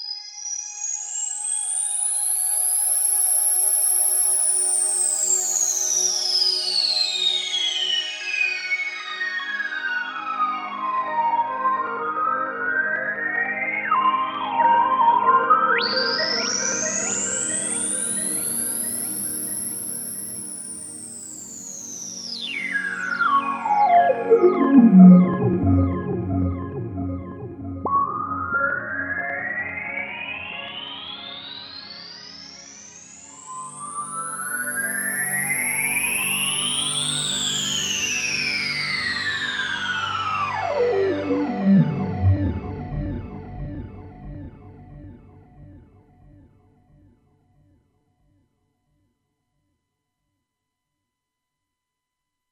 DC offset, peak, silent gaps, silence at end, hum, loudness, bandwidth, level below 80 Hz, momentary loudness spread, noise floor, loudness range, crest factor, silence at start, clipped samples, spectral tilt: under 0.1%; -2 dBFS; none; 6.7 s; none; -21 LUFS; 18 kHz; -50 dBFS; 17 LU; -83 dBFS; 13 LU; 22 dB; 0 s; under 0.1%; -3 dB/octave